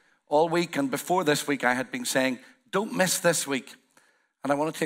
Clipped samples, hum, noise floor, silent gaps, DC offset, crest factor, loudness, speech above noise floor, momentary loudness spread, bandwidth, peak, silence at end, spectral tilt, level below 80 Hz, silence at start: under 0.1%; none; -64 dBFS; none; under 0.1%; 20 dB; -26 LUFS; 38 dB; 7 LU; 16 kHz; -8 dBFS; 0 s; -3.5 dB/octave; -78 dBFS; 0.3 s